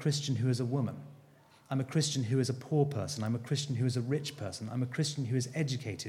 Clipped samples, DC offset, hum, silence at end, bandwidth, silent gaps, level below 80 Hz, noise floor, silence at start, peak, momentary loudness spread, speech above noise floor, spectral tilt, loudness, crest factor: under 0.1%; under 0.1%; none; 0 s; 14 kHz; none; -72 dBFS; -60 dBFS; 0 s; -16 dBFS; 7 LU; 28 dB; -5.5 dB/octave; -33 LUFS; 16 dB